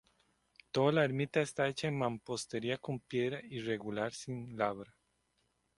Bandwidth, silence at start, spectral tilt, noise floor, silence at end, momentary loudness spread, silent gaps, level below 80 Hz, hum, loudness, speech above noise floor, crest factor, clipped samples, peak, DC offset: 11.5 kHz; 0.75 s; -5.5 dB/octave; -78 dBFS; 0.95 s; 10 LU; none; -72 dBFS; none; -36 LUFS; 43 dB; 22 dB; under 0.1%; -16 dBFS; under 0.1%